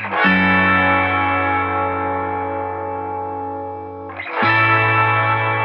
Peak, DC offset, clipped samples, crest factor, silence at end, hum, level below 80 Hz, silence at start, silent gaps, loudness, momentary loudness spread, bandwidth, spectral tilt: -4 dBFS; under 0.1%; under 0.1%; 14 dB; 0 s; none; -52 dBFS; 0 s; none; -17 LUFS; 14 LU; 5.8 kHz; -8.5 dB/octave